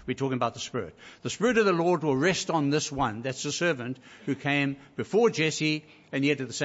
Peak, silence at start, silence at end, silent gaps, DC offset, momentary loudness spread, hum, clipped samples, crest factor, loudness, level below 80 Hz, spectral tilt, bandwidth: -10 dBFS; 0 s; 0 s; none; under 0.1%; 12 LU; none; under 0.1%; 18 dB; -27 LUFS; -60 dBFS; -4.5 dB/octave; 8 kHz